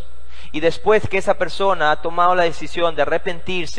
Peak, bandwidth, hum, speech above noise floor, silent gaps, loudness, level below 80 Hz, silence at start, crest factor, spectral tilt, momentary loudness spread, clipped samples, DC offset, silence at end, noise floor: -2 dBFS; 10.5 kHz; none; 23 dB; none; -19 LUFS; -42 dBFS; 0 s; 16 dB; -4.5 dB/octave; 7 LU; under 0.1%; 10%; 0 s; -42 dBFS